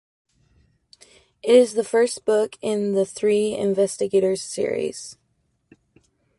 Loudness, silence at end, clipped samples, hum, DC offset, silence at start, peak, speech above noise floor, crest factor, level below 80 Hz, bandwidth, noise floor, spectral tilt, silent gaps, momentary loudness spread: -21 LUFS; 1.25 s; under 0.1%; none; under 0.1%; 1.45 s; -4 dBFS; 49 dB; 20 dB; -64 dBFS; 11.5 kHz; -69 dBFS; -4.5 dB/octave; none; 11 LU